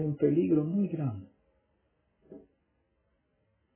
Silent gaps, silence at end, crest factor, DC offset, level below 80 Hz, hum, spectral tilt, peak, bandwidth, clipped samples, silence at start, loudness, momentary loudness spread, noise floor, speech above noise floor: none; 1.35 s; 18 dB; under 0.1%; -66 dBFS; none; -11 dB/octave; -16 dBFS; 3.3 kHz; under 0.1%; 0 s; -29 LUFS; 10 LU; -75 dBFS; 47 dB